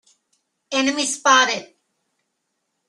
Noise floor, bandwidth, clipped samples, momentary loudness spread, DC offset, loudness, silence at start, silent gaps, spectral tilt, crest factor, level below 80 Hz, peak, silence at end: -75 dBFS; 12.5 kHz; under 0.1%; 10 LU; under 0.1%; -18 LUFS; 0.7 s; none; 0 dB/octave; 20 dB; -70 dBFS; -2 dBFS; 1.25 s